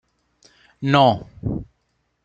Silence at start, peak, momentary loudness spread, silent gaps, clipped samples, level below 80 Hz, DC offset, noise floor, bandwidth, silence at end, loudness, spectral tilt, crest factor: 0.8 s; -2 dBFS; 13 LU; none; under 0.1%; -46 dBFS; under 0.1%; -70 dBFS; 8 kHz; 0.6 s; -20 LUFS; -7 dB/octave; 22 dB